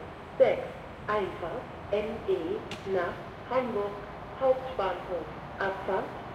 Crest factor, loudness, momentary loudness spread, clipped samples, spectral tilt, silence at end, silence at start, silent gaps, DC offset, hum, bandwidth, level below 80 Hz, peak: 20 dB; -31 LUFS; 14 LU; under 0.1%; -6.5 dB/octave; 0 s; 0 s; none; under 0.1%; none; 10 kHz; -54 dBFS; -10 dBFS